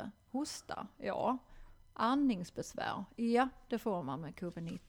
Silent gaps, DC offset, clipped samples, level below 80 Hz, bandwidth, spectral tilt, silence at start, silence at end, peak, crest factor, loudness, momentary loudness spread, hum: none; under 0.1%; under 0.1%; -62 dBFS; 19 kHz; -5.5 dB/octave; 0 s; 0.1 s; -20 dBFS; 18 dB; -37 LUFS; 11 LU; none